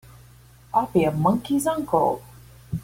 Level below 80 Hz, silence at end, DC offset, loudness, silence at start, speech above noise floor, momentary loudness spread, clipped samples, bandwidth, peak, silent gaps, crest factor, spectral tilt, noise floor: -50 dBFS; 0 s; under 0.1%; -23 LUFS; 0.75 s; 28 dB; 7 LU; under 0.1%; 16.5 kHz; -8 dBFS; none; 16 dB; -6.5 dB/octave; -50 dBFS